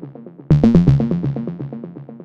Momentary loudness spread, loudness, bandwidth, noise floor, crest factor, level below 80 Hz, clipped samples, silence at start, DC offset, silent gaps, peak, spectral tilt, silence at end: 21 LU; -15 LUFS; 6.2 kHz; -36 dBFS; 16 dB; -32 dBFS; under 0.1%; 0 s; under 0.1%; none; -2 dBFS; -10.5 dB/octave; 0 s